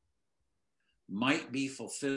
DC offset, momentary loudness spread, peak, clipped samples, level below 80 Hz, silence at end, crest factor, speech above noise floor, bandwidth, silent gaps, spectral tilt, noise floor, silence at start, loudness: under 0.1%; 7 LU; -14 dBFS; under 0.1%; -82 dBFS; 0 s; 22 dB; 51 dB; 11.5 kHz; none; -4 dB/octave; -85 dBFS; 1.1 s; -34 LUFS